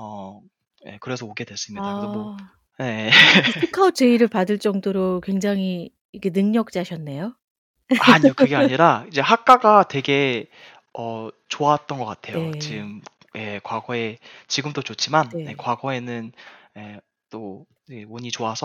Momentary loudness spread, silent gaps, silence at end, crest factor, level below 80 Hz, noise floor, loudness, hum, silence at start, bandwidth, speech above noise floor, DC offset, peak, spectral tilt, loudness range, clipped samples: 22 LU; 6.01-6.13 s, 7.44-7.74 s; 0 s; 20 dB; -66 dBFS; -40 dBFS; -19 LUFS; none; 0 s; 16 kHz; 19 dB; under 0.1%; 0 dBFS; -4.5 dB/octave; 11 LU; under 0.1%